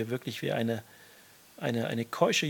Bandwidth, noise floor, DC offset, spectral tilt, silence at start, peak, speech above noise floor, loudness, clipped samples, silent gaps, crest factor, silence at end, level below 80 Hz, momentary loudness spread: 18 kHz; -56 dBFS; under 0.1%; -4.5 dB/octave; 0 s; -10 dBFS; 26 dB; -32 LUFS; under 0.1%; none; 22 dB; 0 s; -78 dBFS; 14 LU